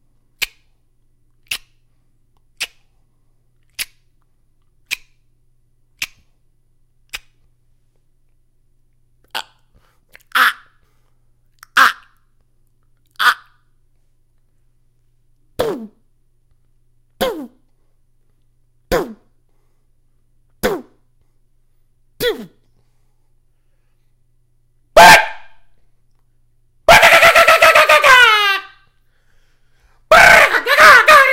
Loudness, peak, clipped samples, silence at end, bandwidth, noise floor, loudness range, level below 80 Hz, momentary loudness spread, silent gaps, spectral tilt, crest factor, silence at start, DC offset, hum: -10 LUFS; 0 dBFS; 0.3%; 0 s; over 20 kHz; -56 dBFS; 23 LU; -44 dBFS; 23 LU; none; -1.5 dB/octave; 16 dB; 0.4 s; under 0.1%; none